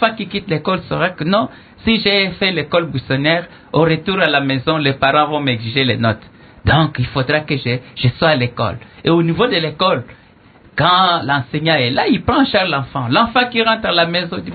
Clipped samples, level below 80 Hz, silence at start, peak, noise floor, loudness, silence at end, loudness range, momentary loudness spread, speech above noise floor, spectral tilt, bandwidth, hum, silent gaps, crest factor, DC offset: under 0.1%; -40 dBFS; 0 s; 0 dBFS; -46 dBFS; -16 LUFS; 0 s; 2 LU; 6 LU; 30 dB; -9.5 dB/octave; 4.8 kHz; none; none; 16 dB; under 0.1%